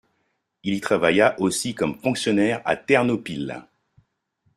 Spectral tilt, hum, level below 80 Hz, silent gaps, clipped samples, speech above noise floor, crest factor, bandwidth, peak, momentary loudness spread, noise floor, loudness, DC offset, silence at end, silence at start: -4.5 dB/octave; none; -60 dBFS; none; under 0.1%; 51 dB; 20 dB; 15 kHz; -4 dBFS; 12 LU; -73 dBFS; -22 LUFS; under 0.1%; 0.95 s; 0.65 s